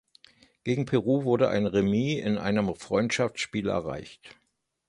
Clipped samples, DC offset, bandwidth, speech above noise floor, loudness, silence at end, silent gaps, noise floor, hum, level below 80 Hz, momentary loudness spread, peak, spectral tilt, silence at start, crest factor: under 0.1%; under 0.1%; 11 kHz; 32 dB; -27 LUFS; 0.55 s; none; -58 dBFS; none; -56 dBFS; 9 LU; -10 dBFS; -6 dB/octave; 0.65 s; 18 dB